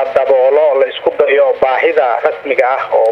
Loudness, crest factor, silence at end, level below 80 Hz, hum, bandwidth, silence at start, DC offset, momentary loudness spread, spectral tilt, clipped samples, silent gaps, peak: -12 LUFS; 12 dB; 0 s; -56 dBFS; none; 5.8 kHz; 0 s; under 0.1%; 4 LU; -4.5 dB/octave; under 0.1%; none; 0 dBFS